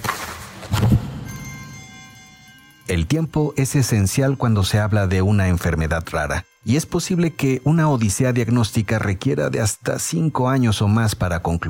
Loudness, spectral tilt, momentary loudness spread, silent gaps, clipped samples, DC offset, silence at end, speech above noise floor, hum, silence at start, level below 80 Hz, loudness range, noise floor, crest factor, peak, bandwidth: -20 LUFS; -5.5 dB/octave; 14 LU; none; under 0.1%; under 0.1%; 0 s; 28 dB; none; 0 s; -38 dBFS; 4 LU; -47 dBFS; 14 dB; -4 dBFS; 17 kHz